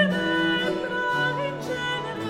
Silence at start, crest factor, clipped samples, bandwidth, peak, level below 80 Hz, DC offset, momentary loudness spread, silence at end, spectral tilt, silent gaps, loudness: 0 s; 16 dB; under 0.1%; 15.5 kHz; -10 dBFS; -56 dBFS; under 0.1%; 6 LU; 0 s; -5 dB/octave; none; -25 LUFS